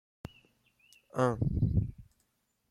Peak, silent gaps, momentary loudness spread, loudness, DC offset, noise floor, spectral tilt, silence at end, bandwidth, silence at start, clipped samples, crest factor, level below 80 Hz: -14 dBFS; none; 21 LU; -32 LUFS; under 0.1%; -77 dBFS; -8.5 dB/octave; 0.7 s; 11.5 kHz; 1.15 s; under 0.1%; 20 dB; -46 dBFS